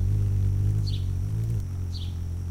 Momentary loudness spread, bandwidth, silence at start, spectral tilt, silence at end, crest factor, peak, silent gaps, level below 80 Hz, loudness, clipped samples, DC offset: 7 LU; 10 kHz; 0 s; -7.5 dB/octave; 0 s; 10 dB; -16 dBFS; none; -34 dBFS; -28 LUFS; under 0.1%; under 0.1%